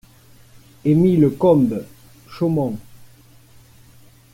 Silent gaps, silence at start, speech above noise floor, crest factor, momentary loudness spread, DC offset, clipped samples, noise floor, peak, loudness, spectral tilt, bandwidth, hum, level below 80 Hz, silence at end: none; 0.85 s; 32 dB; 16 dB; 12 LU; under 0.1%; under 0.1%; -48 dBFS; -4 dBFS; -18 LUFS; -9.5 dB/octave; 16.5 kHz; none; -52 dBFS; 1.3 s